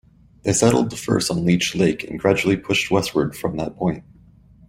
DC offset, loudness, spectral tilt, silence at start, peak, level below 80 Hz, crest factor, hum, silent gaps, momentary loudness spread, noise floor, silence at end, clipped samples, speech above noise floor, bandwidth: under 0.1%; -20 LUFS; -4.5 dB/octave; 0.45 s; -2 dBFS; -48 dBFS; 18 dB; none; none; 8 LU; -50 dBFS; 0.7 s; under 0.1%; 30 dB; 16 kHz